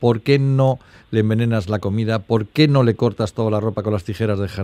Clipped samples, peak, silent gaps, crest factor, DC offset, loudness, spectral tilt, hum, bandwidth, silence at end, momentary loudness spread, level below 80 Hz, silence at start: under 0.1%; 0 dBFS; none; 18 dB; under 0.1%; -19 LUFS; -8 dB/octave; none; 13.5 kHz; 0 s; 7 LU; -52 dBFS; 0 s